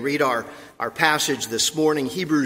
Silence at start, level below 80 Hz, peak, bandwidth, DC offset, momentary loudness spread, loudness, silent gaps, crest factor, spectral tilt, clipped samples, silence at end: 0 s; -62 dBFS; -2 dBFS; 16 kHz; under 0.1%; 11 LU; -22 LUFS; none; 22 dB; -3 dB/octave; under 0.1%; 0 s